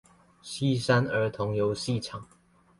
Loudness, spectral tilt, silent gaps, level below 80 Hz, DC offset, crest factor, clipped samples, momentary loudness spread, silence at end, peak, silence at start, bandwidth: -28 LUFS; -6 dB/octave; none; -60 dBFS; under 0.1%; 20 dB; under 0.1%; 16 LU; 0.55 s; -10 dBFS; 0.45 s; 11.5 kHz